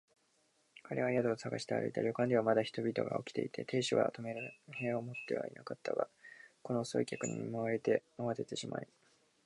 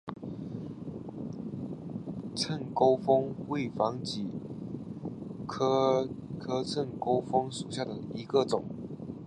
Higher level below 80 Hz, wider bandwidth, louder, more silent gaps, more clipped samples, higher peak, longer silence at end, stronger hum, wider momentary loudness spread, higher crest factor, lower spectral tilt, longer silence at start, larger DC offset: second, -80 dBFS vs -62 dBFS; about the same, 11.5 kHz vs 11.5 kHz; second, -37 LUFS vs -32 LUFS; neither; neither; second, -16 dBFS vs -12 dBFS; first, 0.6 s vs 0 s; neither; about the same, 12 LU vs 14 LU; about the same, 22 dB vs 20 dB; about the same, -5.5 dB/octave vs -6 dB/octave; first, 0.75 s vs 0.05 s; neither